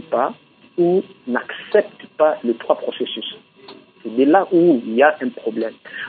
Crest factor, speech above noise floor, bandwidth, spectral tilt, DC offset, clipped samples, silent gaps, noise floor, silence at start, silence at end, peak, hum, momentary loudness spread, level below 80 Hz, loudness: 18 dB; 25 dB; 4.7 kHz; -10.5 dB/octave; under 0.1%; under 0.1%; none; -44 dBFS; 0.1 s; 0 s; 0 dBFS; none; 13 LU; -76 dBFS; -19 LUFS